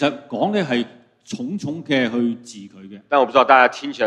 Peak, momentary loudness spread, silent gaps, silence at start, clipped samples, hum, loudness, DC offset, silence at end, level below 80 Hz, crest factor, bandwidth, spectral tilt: 0 dBFS; 20 LU; none; 0 s; under 0.1%; none; -18 LUFS; under 0.1%; 0 s; -66 dBFS; 20 dB; 10.5 kHz; -5 dB/octave